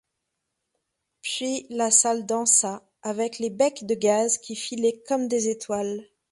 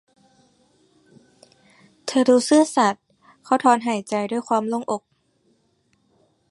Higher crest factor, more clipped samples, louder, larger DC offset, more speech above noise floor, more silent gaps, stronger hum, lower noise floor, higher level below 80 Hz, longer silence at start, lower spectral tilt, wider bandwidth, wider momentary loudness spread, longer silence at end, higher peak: about the same, 20 dB vs 20 dB; neither; second, -24 LUFS vs -20 LUFS; neither; first, 56 dB vs 46 dB; neither; neither; first, -81 dBFS vs -65 dBFS; about the same, -70 dBFS vs -74 dBFS; second, 1.25 s vs 2.05 s; second, -2 dB/octave vs -4 dB/octave; about the same, 11.5 kHz vs 11.5 kHz; about the same, 13 LU vs 13 LU; second, 0.3 s vs 1.55 s; about the same, -4 dBFS vs -2 dBFS